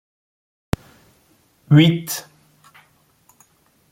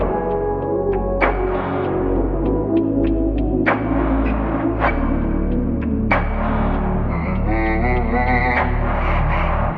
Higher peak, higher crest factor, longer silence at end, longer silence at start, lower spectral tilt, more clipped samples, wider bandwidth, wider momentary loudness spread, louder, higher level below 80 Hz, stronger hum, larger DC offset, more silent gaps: about the same, -2 dBFS vs -2 dBFS; first, 22 dB vs 16 dB; first, 1.7 s vs 0 s; first, 1.7 s vs 0 s; second, -6 dB/octave vs -10.5 dB/octave; neither; first, 16.5 kHz vs 4.9 kHz; first, 15 LU vs 3 LU; about the same, -18 LUFS vs -19 LUFS; second, -48 dBFS vs -24 dBFS; neither; neither; neither